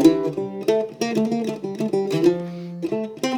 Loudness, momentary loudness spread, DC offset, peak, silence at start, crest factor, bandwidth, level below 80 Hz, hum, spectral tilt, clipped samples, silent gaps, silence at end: -23 LUFS; 8 LU; under 0.1%; -2 dBFS; 0 s; 20 dB; 19 kHz; -66 dBFS; none; -6 dB/octave; under 0.1%; none; 0 s